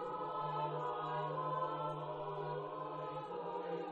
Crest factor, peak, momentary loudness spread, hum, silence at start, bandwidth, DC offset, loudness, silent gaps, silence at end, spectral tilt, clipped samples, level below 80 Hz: 14 dB; -28 dBFS; 5 LU; none; 0 s; 8 kHz; under 0.1%; -41 LUFS; none; 0 s; -8 dB/octave; under 0.1%; -76 dBFS